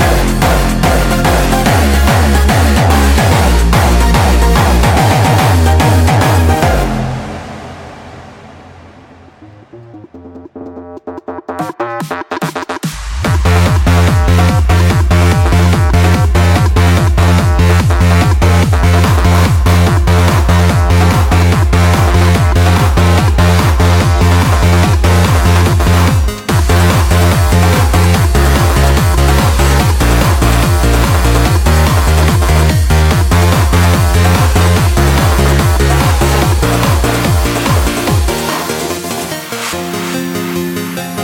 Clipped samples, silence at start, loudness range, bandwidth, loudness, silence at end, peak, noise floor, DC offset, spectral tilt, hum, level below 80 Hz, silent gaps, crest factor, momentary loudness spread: under 0.1%; 0 s; 7 LU; 17 kHz; -10 LUFS; 0 s; 0 dBFS; -38 dBFS; under 0.1%; -5.5 dB/octave; none; -14 dBFS; none; 10 dB; 9 LU